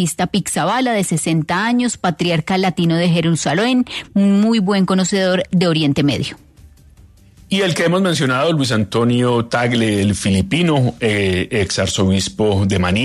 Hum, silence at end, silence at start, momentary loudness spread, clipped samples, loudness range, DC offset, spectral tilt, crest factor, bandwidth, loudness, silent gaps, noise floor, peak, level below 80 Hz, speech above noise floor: none; 0 s; 0 s; 3 LU; under 0.1%; 2 LU; under 0.1%; -5 dB/octave; 14 dB; 13.5 kHz; -16 LUFS; none; -45 dBFS; -2 dBFS; -46 dBFS; 30 dB